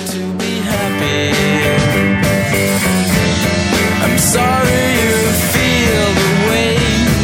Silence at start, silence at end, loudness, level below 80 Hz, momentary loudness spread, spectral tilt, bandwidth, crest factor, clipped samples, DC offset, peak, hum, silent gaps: 0 s; 0 s; -13 LUFS; -30 dBFS; 4 LU; -4 dB/octave; 17 kHz; 12 dB; under 0.1%; under 0.1%; 0 dBFS; none; none